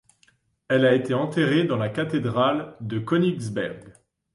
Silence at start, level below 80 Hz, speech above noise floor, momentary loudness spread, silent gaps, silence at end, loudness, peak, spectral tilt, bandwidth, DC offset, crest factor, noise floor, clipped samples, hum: 0.7 s; -62 dBFS; 41 dB; 11 LU; none; 0.45 s; -23 LUFS; -8 dBFS; -7 dB/octave; 11.5 kHz; under 0.1%; 16 dB; -63 dBFS; under 0.1%; none